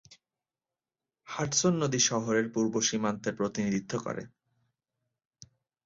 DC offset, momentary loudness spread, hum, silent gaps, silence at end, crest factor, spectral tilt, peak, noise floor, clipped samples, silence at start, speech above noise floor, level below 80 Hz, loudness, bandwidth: under 0.1%; 10 LU; none; none; 1.6 s; 20 dB; -3.5 dB/octave; -12 dBFS; under -90 dBFS; under 0.1%; 0.1 s; over 61 dB; -68 dBFS; -29 LUFS; 7.8 kHz